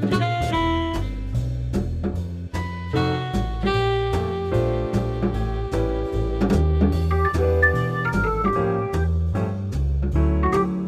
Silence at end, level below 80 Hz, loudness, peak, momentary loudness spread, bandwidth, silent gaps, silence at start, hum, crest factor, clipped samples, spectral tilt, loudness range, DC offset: 0 s; -28 dBFS; -23 LUFS; -6 dBFS; 7 LU; 12 kHz; none; 0 s; none; 14 dB; under 0.1%; -7.5 dB/octave; 4 LU; under 0.1%